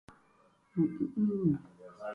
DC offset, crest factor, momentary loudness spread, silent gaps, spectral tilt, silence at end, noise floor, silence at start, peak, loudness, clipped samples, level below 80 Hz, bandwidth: under 0.1%; 16 dB; 13 LU; none; -11 dB/octave; 0 s; -67 dBFS; 0.75 s; -18 dBFS; -33 LUFS; under 0.1%; -66 dBFS; 5 kHz